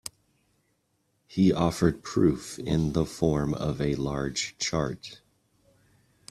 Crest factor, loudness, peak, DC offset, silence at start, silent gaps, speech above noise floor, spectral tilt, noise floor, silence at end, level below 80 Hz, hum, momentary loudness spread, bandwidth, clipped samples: 20 dB; -27 LUFS; -8 dBFS; under 0.1%; 1.3 s; none; 47 dB; -5.5 dB/octave; -73 dBFS; 1.15 s; -48 dBFS; none; 10 LU; 13.5 kHz; under 0.1%